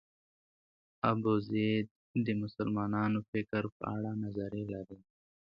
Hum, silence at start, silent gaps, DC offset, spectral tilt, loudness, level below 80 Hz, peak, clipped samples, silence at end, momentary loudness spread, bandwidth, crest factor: none; 1.05 s; 1.91-2.14 s, 3.28-3.33 s, 3.72-3.80 s; under 0.1%; -9.5 dB/octave; -35 LUFS; -64 dBFS; -14 dBFS; under 0.1%; 0.45 s; 7 LU; 5.4 kHz; 22 dB